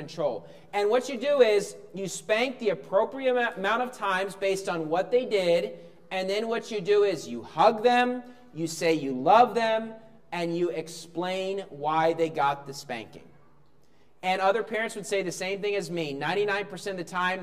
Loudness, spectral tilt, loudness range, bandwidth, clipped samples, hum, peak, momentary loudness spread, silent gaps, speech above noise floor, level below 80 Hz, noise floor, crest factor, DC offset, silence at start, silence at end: -27 LUFS; -4 dB/octave; 5 LU; 15 kHz; under 0.1%; none; -6 dBFS; 13 LU; none; 37 dB; -72 dBFS; -63 dBFS; 22 dB; 0.2%; 0 s; 0 s